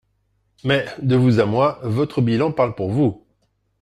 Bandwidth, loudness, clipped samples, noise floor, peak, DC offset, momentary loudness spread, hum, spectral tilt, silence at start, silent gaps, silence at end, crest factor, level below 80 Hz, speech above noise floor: 10.5 kHz; -19 LUFS; under 0.1%; -67 dBFS; -4 dBFS; under 0.1%; 6 LU; none; -8 dB/octave; 0.65 s; none; 0.65 s; 16 dB; -54 dBFS; 49 dB